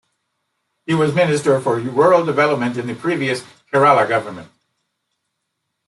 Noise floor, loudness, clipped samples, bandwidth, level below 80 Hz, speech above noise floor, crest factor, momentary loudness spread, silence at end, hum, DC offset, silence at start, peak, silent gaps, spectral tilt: -75 dBFS; -17 LUFS; under 0.1%; 12 kHz; -64 dBFS; 59 dB; 16 dB; 10 LU; 1.45 s; none; under 0.1%; 0.9 s; -2 dBFS; none; -6 dB/octave